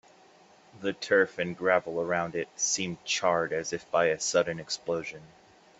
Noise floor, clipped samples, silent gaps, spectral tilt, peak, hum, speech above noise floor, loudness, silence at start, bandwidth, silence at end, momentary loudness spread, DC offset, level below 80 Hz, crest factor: -58 dBFS; under 0.1%; none; -2.5 dB/octave; -8 dBFS; none; 29 dB; -28 LUFS; 0.75 s; 8.4 kHz; 0.5 s; 9 LU; under 0.1%; -70 dBFS; 22 dB